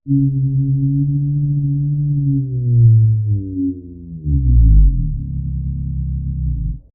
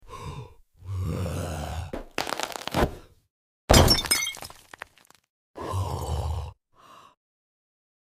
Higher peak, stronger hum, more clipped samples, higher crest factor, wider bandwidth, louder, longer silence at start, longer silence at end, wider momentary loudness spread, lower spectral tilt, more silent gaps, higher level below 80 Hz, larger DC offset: about the same, -2 dBFS vs -4 dBFS; neither; neither; second, 14 dB vs 26 dB; second, 0.6 kHz vs 16 kHz; first, -17 LUFS vs -26 LUFS; about the same, 0.05 s vs 0.05 s; second, 0.15 s vs 1.05 s; second, 11 LU vs 24 LU; first, -23.5 dB/octave vs -4 dB/octave; second, none vs 3.30-3.68 s, 5.29-5.54 s; first, -20 dBFS vs -36 dBFS; neither